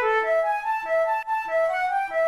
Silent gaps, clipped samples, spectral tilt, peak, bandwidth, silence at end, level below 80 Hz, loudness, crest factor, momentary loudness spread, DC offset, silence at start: none; under 0.1%; -2 dB/octave; -14 dBFS; 12.5 kHz; 0 s; -60 dBFS; -24 LUFS; 10 dB; 4 LU; 0.1%; 0 s